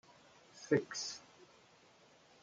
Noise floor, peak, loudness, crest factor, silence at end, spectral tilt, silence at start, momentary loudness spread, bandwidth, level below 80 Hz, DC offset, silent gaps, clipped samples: -66 dBFS; -20 dBFS; -38 LUFS; 24 dB; 1 s; -4 dB/octave; 0.55 s; 25 LU; 9.4 kHz; -82 dBFS; under 0.1%; none; under 0.1%